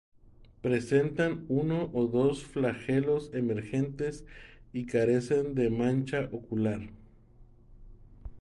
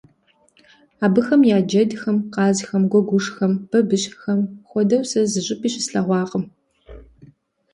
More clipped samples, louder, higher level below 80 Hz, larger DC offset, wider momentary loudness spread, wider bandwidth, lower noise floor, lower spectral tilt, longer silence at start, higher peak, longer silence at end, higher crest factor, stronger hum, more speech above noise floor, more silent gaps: neither; second, -30 LUFS vs -19 LUFS; about the same, -54 dBFS vs -56 dBFS; neither; first, 11 LU vs 7 LU; about the same, 11.5 kHz vs 11 kHz; second, -56 dBFS vs -60 dBFS; first, -7.5 dB/octave vs -5.5 dB/octave; second, 0.4 s vs 1 s; second, -14 dBFS vs -4 dBFS; second, 0 s vs 0.75 s; about the same, 18 dB vs 16 dB; neither; second, 26 dB vs 41 dB; neither